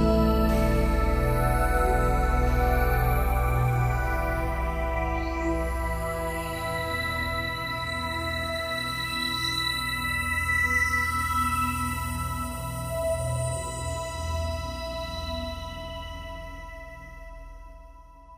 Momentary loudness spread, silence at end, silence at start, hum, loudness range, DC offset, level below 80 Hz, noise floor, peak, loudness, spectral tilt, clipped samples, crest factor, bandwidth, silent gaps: 13 LU; 0 s; 0 s; none; 9 LU; under 0.1%; -30 dBFS; -48 dBFS; -10 dBFS; -27 LUFS; -5 dB/octave; under 0.1%; 16 dB; 15.5 kHz; none